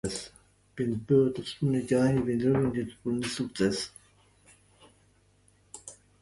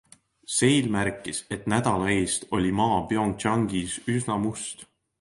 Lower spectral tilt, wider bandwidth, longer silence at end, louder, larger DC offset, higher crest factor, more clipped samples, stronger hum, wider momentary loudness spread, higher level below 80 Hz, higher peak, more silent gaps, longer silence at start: first, -6 dB/octave vs -4.5 dB/octave; about the same, 11.5 kHz vs 11.5 kHz; about the same, 0.3 s vs 0.35 s; second, -29 LUFS vs -25 LUFS; neither; about the same, 18 dB vs 18 dB; neither; first, 50 Hz at -60 dBFS vs none; first, 21 LU vs 9 LU; second, -58 dBFS vs -50 dBFS; second, -12 dBFS vs -8 dBFS; neither; second, 0.05 s vs 0.5 s